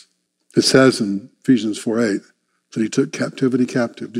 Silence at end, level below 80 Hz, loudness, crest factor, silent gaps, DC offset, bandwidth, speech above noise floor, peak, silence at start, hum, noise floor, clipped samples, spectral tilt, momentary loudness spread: 0 s; -62 dBFS; -18 LUFS; 18 dB; none; under 0.1%; 13 kHz; 43 dB; 0 dBFS; 0.55 s; none; -60 dBFS; under 0.1%; -5 dB/octave; 11 LU